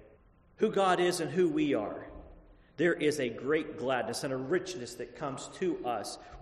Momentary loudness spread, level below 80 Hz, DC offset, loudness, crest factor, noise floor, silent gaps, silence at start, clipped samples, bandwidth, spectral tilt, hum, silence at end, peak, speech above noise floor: 12 LU; -60 dBFS; under 0.1%; -32 LUFS; 18 dB; -61 dBFS; none; 0 s; under 0.1%; 13 kHz; -5 dB/octave; none; 0 s; -14 dBFS; 30 dB